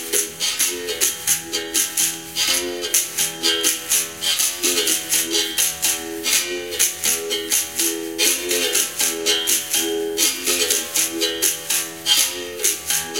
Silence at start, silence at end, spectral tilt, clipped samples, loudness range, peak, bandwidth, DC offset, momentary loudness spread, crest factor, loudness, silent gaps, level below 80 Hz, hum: 0 s; 0 s; 0.5 dB/octave; under 0.1%; 1 LU; 0 dBFS; 17 kHz; 0.2%; 4 LU; 22 dB; -18 LUFS; none; -58 dBFS; none